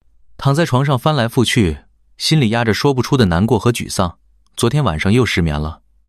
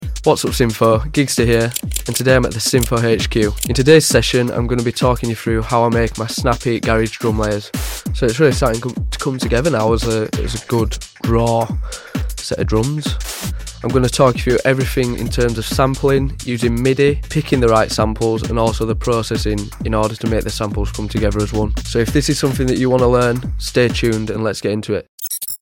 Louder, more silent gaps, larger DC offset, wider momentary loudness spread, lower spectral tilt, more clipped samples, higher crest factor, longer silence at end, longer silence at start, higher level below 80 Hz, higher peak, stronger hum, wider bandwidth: about the same, -16 LUFS vs -17 LUFS; second, none vs 25.08-25.18 s; first, 0.1% vs under 0.1%; about the same, 7 LU vs 8 LU; about the same, -5.5 dB/octave vs -5 dB/octave; neither; about the same, 14 dB vs 16 dB; first, 0.35 s vs 0.05 s; first, 0.4 s vs 0 s; second, -38 dBFS vs -26 dBFS; about the same, -2 dBFS vs 0 dBFS; neither; second, 14.5 kHz vs 17 kHz